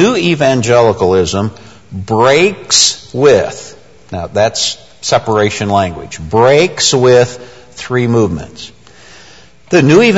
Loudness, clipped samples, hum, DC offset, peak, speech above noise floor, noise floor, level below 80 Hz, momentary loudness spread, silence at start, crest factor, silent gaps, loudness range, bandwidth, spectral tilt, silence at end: -11 LUFS; 0.1%; none; 0.7%; 0 dBFS; 30 dB; -40 dBFS; -42 dBFS; 17 LU; 0 s; 12 dB; none; 3 LU; 11 kHz; -4 dB/octave; 0 s